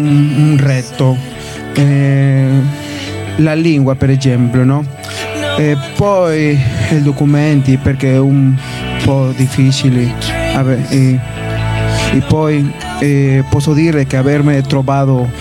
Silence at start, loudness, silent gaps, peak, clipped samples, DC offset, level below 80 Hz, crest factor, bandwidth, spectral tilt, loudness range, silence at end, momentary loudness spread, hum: 0 s; -12 LUFS; none; 0 dBFS; under 0.1%; under 0.1%; -32 dBFS; 12 dB; 12.5 kHz; -7 dB/octave; 1 LU; 0 s; 7 LU; none